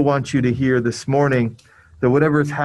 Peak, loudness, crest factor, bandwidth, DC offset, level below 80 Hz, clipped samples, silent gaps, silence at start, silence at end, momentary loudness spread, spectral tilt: -2 dBFS; -18 LUFS; 16 dB; 11.5 kHz; under 0.1%; -48 dBFS; under 0.1%; none; 0 s; 0 s; 5 LU; -7 dB/octave